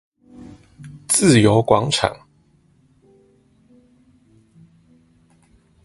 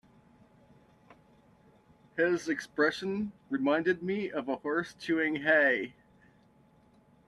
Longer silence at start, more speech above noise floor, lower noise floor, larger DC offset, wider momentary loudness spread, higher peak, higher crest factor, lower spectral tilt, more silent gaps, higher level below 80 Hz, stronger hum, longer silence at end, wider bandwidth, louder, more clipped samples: second, 0.4 s vs 2.15 s; first, 42 dB vs 33 dB; second, -57 dBFS vs -63 dBFS; neither; first, 21 LU vs 10 LU; first, 0 dBFS vs -14 dBFS; about the same, 22 dB vs 20 dB; about the same, -4.5 dB/octave vs -5.5 dB/octave; neither; first, -50 dBFS vs -72 dBFS; neither; first, 3.7 s vs 1.4 s; about the same, 12 kHz vs 12 kHz; first, -16 LUFS vs -30 LUFS; neither